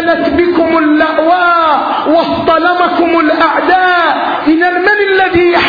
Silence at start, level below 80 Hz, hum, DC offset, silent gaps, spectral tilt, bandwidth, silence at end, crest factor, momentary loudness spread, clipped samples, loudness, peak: 0 s; -42 dBFS; none; under 0.1%; none; -6.5 dB/octave; 5 kHz; 0 s; 10 dB; 2 LU; under 0.1%; -9 LUFS; 0 dBFS